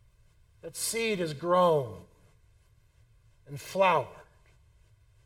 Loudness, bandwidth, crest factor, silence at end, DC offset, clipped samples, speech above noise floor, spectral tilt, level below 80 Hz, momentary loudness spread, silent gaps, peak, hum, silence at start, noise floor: -28 LUFS; 17 kHz; 20 dB; 1.05 s; under 0.1%; under 0.1%; 35 dB; -4 dB/octave; -64 dBFS; 21 LU; none; -12 dBFS; none; 0.65 s; -63 dBFS